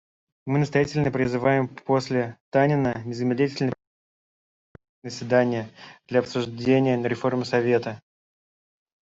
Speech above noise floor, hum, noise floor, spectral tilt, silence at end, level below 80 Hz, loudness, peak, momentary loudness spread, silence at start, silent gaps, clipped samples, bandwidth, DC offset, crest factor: over 67 dB; none; under -90 dBFS; -7 dB/octave; 1.05 s; -60 dBFS; -24 LUFS; -6 dBFS; 14 LU; 0.45 s; 2.40-2.52 s, 3.87-4.75 s, 4.89-5.02 s; under 0.1%; 7.8 kHz; under 0.1%; 18 dB